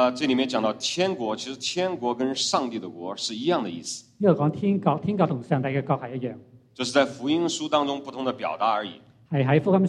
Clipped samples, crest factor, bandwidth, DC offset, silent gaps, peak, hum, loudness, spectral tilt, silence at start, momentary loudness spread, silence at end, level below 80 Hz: under 0.1%; 20 dB; 11.5 kHz; under 0.1%; none; -6 dBFS; none; -25 LUFS; -5 dB/octave; 0 s; 10 LU; 0 s; -68 dBFS